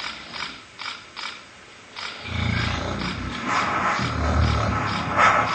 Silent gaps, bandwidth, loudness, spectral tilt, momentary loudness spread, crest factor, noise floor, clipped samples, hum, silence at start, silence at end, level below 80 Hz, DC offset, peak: none; 9 kHz; -24 LUFS; -5 dB/octave; 14 LU; 20 dB; -45 dBFS; under 0.1%; none; 0 s; 0 s; -34 dBFS; under 0.1%; -4 dBFS